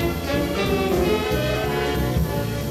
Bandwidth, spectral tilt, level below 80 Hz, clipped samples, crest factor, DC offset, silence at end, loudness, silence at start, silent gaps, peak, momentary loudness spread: 16 kHz; -5.5 dB/octave; -32 dBFS; under 0.1%; 14 dB; under 0.1%; 0 s; -22 LUFS; 0 s; none; -8 dBFS; 3 LU